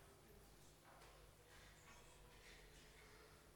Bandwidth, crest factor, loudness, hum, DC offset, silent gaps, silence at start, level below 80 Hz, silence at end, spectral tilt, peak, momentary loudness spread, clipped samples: 19 kHz; 14 dB; -65 LUFS; none; under 0.1%; none; 0 s; -72 dBFS; 0 s; -3 dB/octave; -50 dBFS; 3 LU; under 0.1%